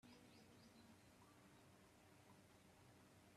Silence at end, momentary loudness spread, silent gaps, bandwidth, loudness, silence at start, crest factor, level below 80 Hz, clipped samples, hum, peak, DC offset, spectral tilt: 0 s; 3 LU; none; 14 kHz; -69 LUFS; 0 s; 14 dB; -86 dBFS; under 0.1%; none; -54 dBFS; under 0.1%; -4.5 dB/octave